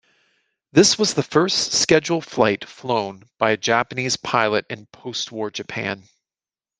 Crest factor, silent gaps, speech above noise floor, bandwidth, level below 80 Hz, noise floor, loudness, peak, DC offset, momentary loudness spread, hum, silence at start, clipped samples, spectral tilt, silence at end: 20 dB; none; over 69 dB; 10.5 kHz; -58 dBFS; under -90 dBFS; -20 LUFS; -2 dBFS; under 0.1%; 12 LU; none; 0.75 s; under 0.1%; -3 dB/octave; 0.8 s